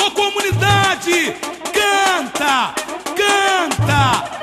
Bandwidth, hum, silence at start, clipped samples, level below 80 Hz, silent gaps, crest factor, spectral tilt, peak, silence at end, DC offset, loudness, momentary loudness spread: 13 kHz; none; 0 s; under 0.1%; -42 dBFS; none; 14 dB; -3.5 dB/octave; -2 dBFS; 0 s; under 0.1%; -16 LUFS; 8 LU